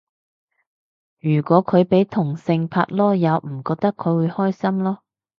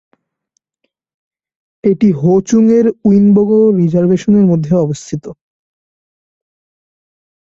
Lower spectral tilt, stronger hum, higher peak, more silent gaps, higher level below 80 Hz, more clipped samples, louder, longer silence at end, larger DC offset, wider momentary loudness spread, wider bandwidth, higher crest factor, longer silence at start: first, -10 dB/octave vs -8.5 dB/octave; neither; about the same, -2 dBFS vs 0 dBFS; neither; second, -62 dBFS vs -50 dBFS; neither; second, -20 LUFS vs -11 LUFS; second, 0.45 s vs 2.2 s; neither; about the same, 7 LU vs 9 LU; second, 6.2 kHz vs 7.8 kHz; first, 18 dB vs 12 dB; second, 1.25 s vs 1.85 s